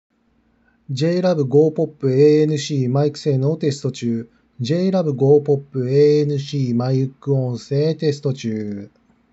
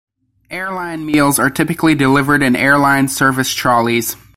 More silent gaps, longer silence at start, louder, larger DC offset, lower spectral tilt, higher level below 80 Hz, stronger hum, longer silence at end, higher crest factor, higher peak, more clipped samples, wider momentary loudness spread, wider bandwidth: neither; first, 0.9 s vs 0.5 s; second, -19 LUFS vs -13 LUFS; neither; first, -7.5 dB/octave vs -4.5 dB/octave; second, -66 dBFS vs -46 dBFS; neither; first, 0.45 s vs 0.2 s; about the same, 16 dB vs 14 dB; about the same, -2 dBFS vs -2 dBFS; neither; about the same, 10 LU vs 11 LU; second, 8 kHz vs 16.5 kHz